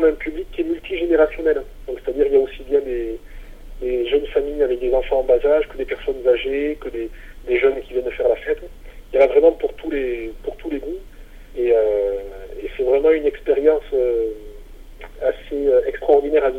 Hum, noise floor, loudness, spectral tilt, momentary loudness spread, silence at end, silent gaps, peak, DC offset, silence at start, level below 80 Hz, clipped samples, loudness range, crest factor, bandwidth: none; -39 dBFS; -20 LUFS; -6.5 dB/octave; 14 LU; 0 s; none; -2 dBFS; under 0.1%; 0 s; -38 dBFS; under 0.1%; 2 LU; 16 dB; 4.9 kHz